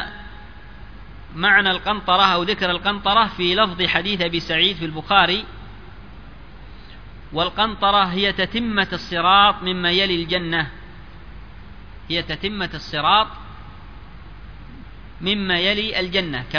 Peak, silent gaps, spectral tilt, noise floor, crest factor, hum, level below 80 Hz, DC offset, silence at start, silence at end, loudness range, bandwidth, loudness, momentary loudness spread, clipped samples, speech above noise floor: 0 dBFS; none; -5 dB/octave; -40 dBFS; 22 dB; none; -42 dBFS; 0.7%; 0 s; 0 s; 6 LU; 5.4 kHz; -19 LUFS; 12 LU; under 0.1%; 21 dB